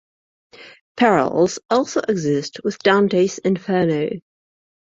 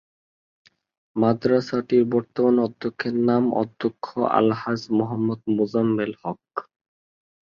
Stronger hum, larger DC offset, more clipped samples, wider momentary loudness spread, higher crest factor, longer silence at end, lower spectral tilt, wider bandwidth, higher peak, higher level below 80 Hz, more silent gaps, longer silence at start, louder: neither; neither; neither; about the same, 9 LU vs 9 LU; about the same, 18 dB vs 18 dB; second, 0.65 s vs 0.95 s; second, -5.5 dB/octave vs -8 dB/octave; first, 7.8 kHz vs 7 kHz; about the same, -2 dBFS vs -4 dBFS; about the same, -60 dBFS vs -64 dBFS; first, 0.81-0.95 s vs none; second, 0.6 s vs 1.15 s; first, -19 LUFS vs -23 LUFS